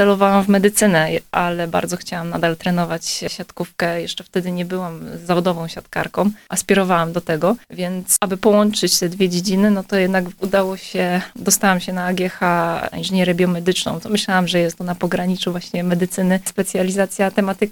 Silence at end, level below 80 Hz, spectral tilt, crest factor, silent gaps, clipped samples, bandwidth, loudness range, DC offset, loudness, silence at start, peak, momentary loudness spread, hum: 0 s; -52 dBFS; -4.5 dB/octave; 18 dB; none; under 0.1%; 19 kHz; 5 LU; under 0.1%; -18 LUFS; 0 s; 0 dBFS; 9 LU; none